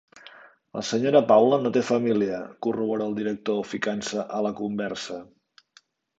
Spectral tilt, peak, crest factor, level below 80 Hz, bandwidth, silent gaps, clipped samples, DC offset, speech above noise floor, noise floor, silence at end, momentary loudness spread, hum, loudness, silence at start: -5.5 dB/octave; -6 dBFS; 20 dB; -68 dBFS; 8 kHz; none; under 0.1%; under 0.1%; 36 dB; -60 dBFS; 0.95 s; 13 LU; none; -24 LUFS; 0.25 s